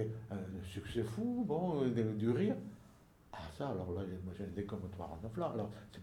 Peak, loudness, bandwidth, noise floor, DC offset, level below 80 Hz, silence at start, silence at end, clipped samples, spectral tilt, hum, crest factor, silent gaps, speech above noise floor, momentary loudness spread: -22 dBFS; -40 LUFS; 17 kHz; -63 dBFS; under 0.1%; -62 dBFS; 0 s; 0 s; under 0.1%; -8 dB/octave; none; 18 dB; none; 24 dB; 11 LU